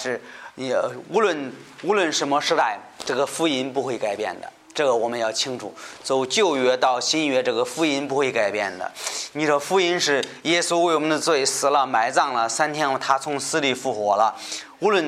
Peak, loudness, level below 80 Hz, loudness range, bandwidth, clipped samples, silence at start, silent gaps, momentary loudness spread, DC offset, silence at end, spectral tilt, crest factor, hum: -4 dBFS; -22 LUFS; -72 dBFS; 3 LU; 15 kHz; under 0.1%; 0 s; none; 10 LU; under 0.1%; 0 s; -2.5 dB/octave; 18 dB; none